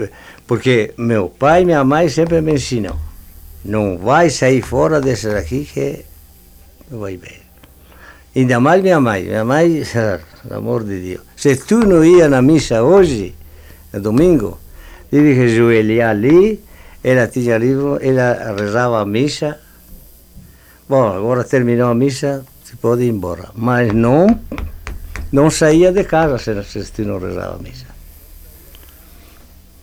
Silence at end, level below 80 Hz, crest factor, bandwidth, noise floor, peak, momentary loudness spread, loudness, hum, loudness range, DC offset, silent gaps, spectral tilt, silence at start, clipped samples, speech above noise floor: 1.05 s; -36 dBFS; 14 dB; 16.5 kHz; -43 dBFS; 0 dBFS; 17 LU; -14 LUFS; none; 6 LU; under 0.1%; none; -6.5 dB/octave; 0 s; under 0.1%; 30 dB